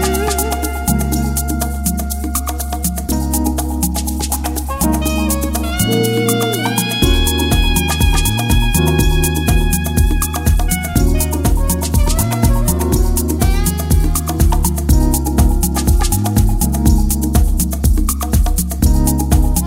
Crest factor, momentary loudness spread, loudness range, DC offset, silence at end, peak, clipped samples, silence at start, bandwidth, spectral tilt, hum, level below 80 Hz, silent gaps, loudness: 14 dB; 4 LU; 4 LU; under 0.1%; 0 s; 0 dBFS; under 0.1%; 0 s; 16.5 kHz; -4.5 dB/octave; none; -16 dBFS; none; -15 LUFS